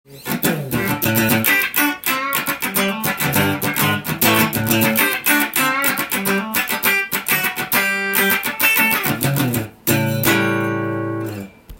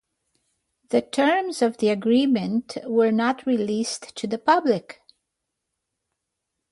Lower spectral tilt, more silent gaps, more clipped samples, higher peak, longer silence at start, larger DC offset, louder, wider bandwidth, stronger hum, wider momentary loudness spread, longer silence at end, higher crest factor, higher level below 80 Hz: second, -3.5 dB/octave vs -5 dB/octave; neither; neither; first, 0 dBFS vs -6 dBFS; second, 0.1 s vs 0.9 s; neither; first, -17 LUFS vs -23 LUFS; first, 17 kHz vs 11.5 kHz; neither; about the same, 7 LU vs 7 LU; second, 0 s vs 1.8 s; about the same, 18 dB vs 18 dB; first, -52 dBFS vs -70 dBFS